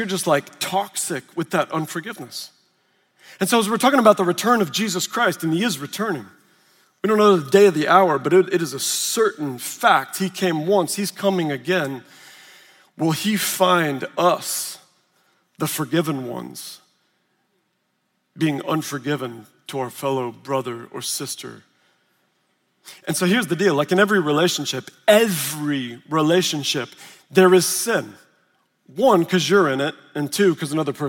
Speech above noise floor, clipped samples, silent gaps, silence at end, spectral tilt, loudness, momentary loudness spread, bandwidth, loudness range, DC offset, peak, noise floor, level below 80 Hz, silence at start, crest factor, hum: 51 dB; under 0.1%; none; 0 s; -4 dB/octave; -20 LUFS; 14 LU; 17 kHz; 10 LU; under 0.1%; 0 dBFS; -71 dBFS; -74 dBFS; 0 s; 20 dB; none